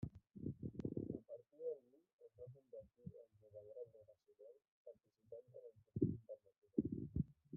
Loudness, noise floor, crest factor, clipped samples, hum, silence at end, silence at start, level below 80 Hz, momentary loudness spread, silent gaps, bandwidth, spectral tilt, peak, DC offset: -49 LUFS; -68 dBFS; 26 dB; under 0.1%; none; 0 s; 0 s; -68 dBFS; 22 LU; 2.13-2.19 s, 4.68-4.85 s, 6.58-6.62 s; 1.9 kHz; -13.5 dB/octave; -24 dBFS; under 0.1%